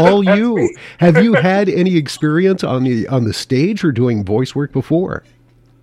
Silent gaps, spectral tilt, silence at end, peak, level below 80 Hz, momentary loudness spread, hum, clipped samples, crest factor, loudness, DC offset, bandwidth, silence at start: none; -7 dB/octave; 0.65 s; 0 dBFS; -48 dBFS; 7 LU; none; under 0.1%; 14 dB; -15 LUFS; under 0.1%; 13 kHz; 0 s